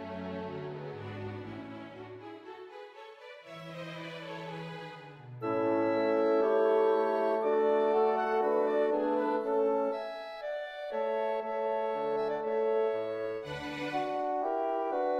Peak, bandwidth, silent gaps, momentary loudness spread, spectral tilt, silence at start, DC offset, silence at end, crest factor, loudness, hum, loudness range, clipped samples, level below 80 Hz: -16 dBFS; 7.8 kHz; none; 19 LU; -7 dB/octave; 0 s; under 0.1%; 0 s; 16 dB; -31 LUFS; none; 16 LU; under 0.1%; -70 dBFS